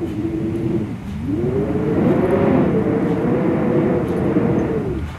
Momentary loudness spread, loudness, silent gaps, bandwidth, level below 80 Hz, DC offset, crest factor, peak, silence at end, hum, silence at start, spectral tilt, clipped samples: 7 LU; -19 LUFS; none; 12.5 kHz; -36 dBFS; under 0.1%; 14 dB; -4 dBFS; 0 s; none; 0 s; -9.5 dB/octave; under 0.1%